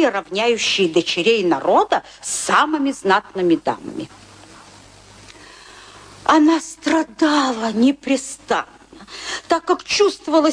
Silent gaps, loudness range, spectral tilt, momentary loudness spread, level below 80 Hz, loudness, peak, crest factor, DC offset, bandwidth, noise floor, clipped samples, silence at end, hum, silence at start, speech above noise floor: none; 5 LU; -3 dB/octave; 11 LU; -56 dBFS; -18 LUFS; -2 dBFS; 18 dB; under 0.1%; 10.5 kHz; -44 dBFS; under 0.1%; 0 s; none; 0 s; 26 dB